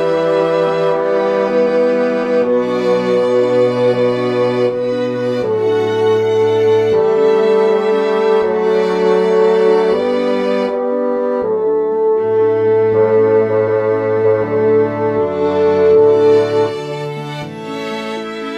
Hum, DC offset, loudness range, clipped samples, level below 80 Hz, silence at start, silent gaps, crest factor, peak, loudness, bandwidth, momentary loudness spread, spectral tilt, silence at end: none; under 0.1%; 2 LU; under 0.1%; -56 dBFS; 0 s; none; 12 dB; -2 dBFS; -14 LUFS; 8.6 kHz; 6 LU; -7 dB/octave; 0 s